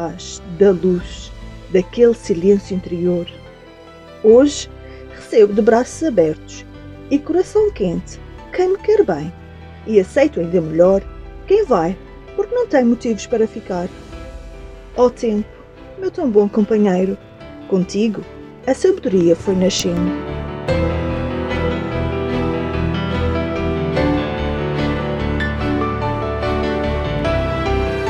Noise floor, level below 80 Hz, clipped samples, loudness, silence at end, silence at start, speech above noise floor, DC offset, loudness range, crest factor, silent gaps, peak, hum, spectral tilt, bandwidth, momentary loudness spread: -40 dBFS; -32 dBFS; under 0.1%; -17 LUFS; 0 s; 0 s; 24 dB; under 0.1%; 4 LU; 18 dB; none; 0 dBFS; none; -6.5 dB/octave; 11 kHz; 19 LU